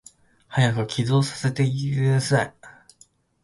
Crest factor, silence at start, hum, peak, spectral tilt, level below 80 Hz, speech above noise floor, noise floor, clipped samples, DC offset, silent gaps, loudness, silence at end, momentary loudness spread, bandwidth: 18 dB; 0.5 s; none; -6 dBFS; -6 dB/octave; -56 dBFS; 37 dB; -58 dBFS; under 0.1%; under 0.1%; none; -23 LUFS; 0.75 s; 4 LU; 11.5 kHz